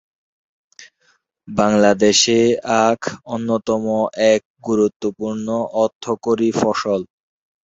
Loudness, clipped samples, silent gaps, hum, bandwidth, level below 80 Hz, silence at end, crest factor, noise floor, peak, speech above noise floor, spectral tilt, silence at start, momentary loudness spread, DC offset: -18 LUFS; under 0.1%; 4.45-4.55 s, 4.96-5.00 s, 5.95-6.01 s; none; 8 kHz; -56 dBFS; 0.6 s; 18 dB; -62 dBFS; -2 dBFS; 45 dB; -4 dB/octave; 0.8 s; 11 LU; under 0.1%